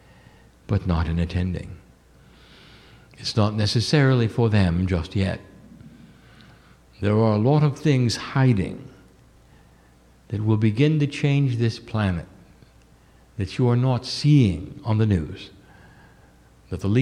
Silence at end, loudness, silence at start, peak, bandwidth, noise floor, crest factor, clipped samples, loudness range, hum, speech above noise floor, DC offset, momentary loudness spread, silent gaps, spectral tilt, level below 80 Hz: 0 s; -22 LUFS; 0.7 s; -6 dBFS; 11 kHz; -54 dBFS; 16 dB; under 0.1%; 2 LU; none; 33 dB; under 0.1%; 13 LU; none; -7 dB/octave; -42 dBFS